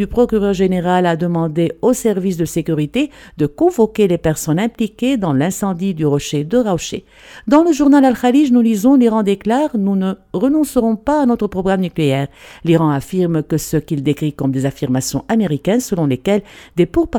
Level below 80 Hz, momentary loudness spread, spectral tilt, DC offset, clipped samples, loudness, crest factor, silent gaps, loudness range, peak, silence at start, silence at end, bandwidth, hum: -42 dBFS; 7 LU; -6.5 dB/octave; under 0.1%; under 0.1%; -16 LUFS; 14 dB; none; 4 LU; 0 dBFS; 0 s; 0 s; 18.5 kHz; none